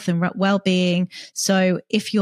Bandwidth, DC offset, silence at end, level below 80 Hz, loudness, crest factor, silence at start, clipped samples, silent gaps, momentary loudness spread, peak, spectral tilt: 13.5 kHz; under 0.1%; 0 s; -70 dBFS; -20 LUFS; 14 dB; 0 s; under 0.1%; none; 5 LU; -6 dBFS; -5 dB/octave